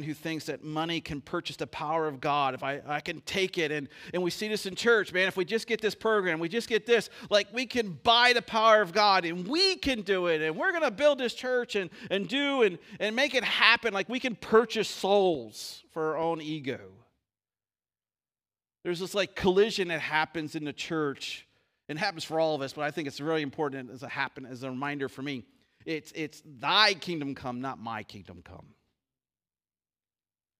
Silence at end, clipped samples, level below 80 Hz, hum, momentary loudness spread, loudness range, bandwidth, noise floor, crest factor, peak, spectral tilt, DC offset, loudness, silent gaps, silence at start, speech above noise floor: 2 s; under 0.1%; -64 dBFS; none; 15 LU; 10 LU; 15.5 kHz; under -90 dBFS; 24 dB; -4 dBFS; -4 dB/octave; under 0.1%; -28 LUFS; none; 0 s; over 61 dB